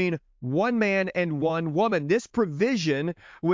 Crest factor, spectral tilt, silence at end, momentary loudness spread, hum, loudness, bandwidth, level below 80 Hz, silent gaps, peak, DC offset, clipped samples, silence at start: 14 dB; -6.5 dB/octave; 0 s; 6 LU; none; -26 LUFS; 7.6 kHz; -64 dBFS; none; -10 dBFS; under 0.1%; under 0.1%; 0 s